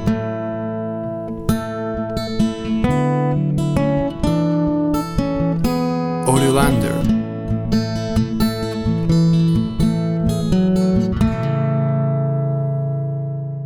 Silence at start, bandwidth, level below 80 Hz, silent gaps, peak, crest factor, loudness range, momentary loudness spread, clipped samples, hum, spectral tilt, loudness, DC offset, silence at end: 0 s; 17 kHz; -34 dBFS; none; -2 dBFS; 16 dB; 2 LU; 8 LU; under 0.1%; none; -7 dB/octave; -19 LUFS; under 0.1%; 0 s